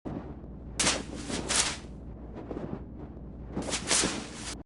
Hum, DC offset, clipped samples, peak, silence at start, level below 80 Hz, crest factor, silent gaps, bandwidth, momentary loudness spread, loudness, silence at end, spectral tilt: none; under 0.1%; under 0.1%; -10 dBFS; 0.05 s; -46 dBFS; 24 dB; none; 11.5 kHz; 18 LU; -30 LUFS; 0.05 s; -2 dB/octave